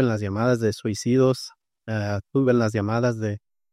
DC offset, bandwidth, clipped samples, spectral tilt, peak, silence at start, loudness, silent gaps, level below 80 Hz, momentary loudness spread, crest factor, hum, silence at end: under 0.1%; 13.5 kHz; under 0.1%; -6.5 dB/octave; -8 dBFS; 0 s; -23 LUFS; none; -60 dBFS; 11 LU; 16 dB; none; 0.35 s